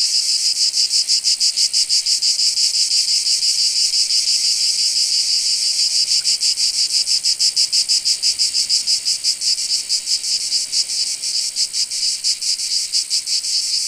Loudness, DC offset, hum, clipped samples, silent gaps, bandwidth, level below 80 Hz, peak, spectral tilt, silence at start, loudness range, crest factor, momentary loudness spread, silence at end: -15 LUFS; under 0.1%; none; under 0.1%; none; 15.5 kHz; -62 dBFS; 0 dBFS; 4.5 dB/octave; 0 s; 3 LU; 18 dB; 4 LU; 0 s